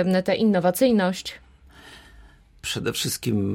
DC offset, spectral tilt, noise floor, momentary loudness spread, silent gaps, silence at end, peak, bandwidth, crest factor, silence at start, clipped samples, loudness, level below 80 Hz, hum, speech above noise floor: under 0.1%; -5 dB/octave; -50 dBFS; 12 LU; none; 0 s; -8 dBFS; 16.5 kHz; 16 dB; 0 s; under 0.1%; -23 LUFS; -54 dBFS; none; 28 dB